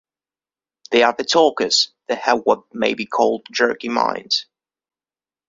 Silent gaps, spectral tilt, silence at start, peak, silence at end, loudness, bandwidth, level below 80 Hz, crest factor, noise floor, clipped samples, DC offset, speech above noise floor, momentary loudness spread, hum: none; -2 dB/octave; 0.9 s; -2 dBFS; 1.05 s; -18 LUFS; 7.8 kHz; -64 dBFS; 20 dB; under -90 dBFS; under 0.1%; under 0.1%; over 72 dB; 6 LU; none